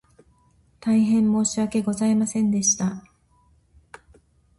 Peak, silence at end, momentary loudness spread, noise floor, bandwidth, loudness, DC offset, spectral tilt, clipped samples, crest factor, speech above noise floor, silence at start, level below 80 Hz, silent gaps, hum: -10 dBFS; 1.6 s; 7 LU; -60 dBFS; 11.5 kHz; -22 LUFS; under 0.1%; -4.5 dB/octave; under 0.1%; 14 dB; 39 dB; 0.85 s; -58 dBFS; none; none